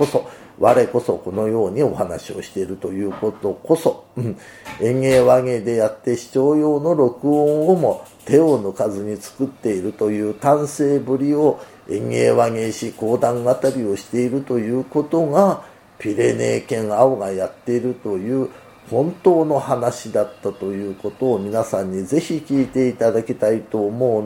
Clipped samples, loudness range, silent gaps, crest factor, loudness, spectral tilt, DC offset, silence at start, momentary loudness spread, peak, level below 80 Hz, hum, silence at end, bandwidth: under 0.1%; 4 LU; none; 18 dB; -19 LUFS; -6.5 dB/octave; under 0.1%; 0 s; 11 LU; 0 dBFS; -56 dBFS; none; 0 s; 17 kHz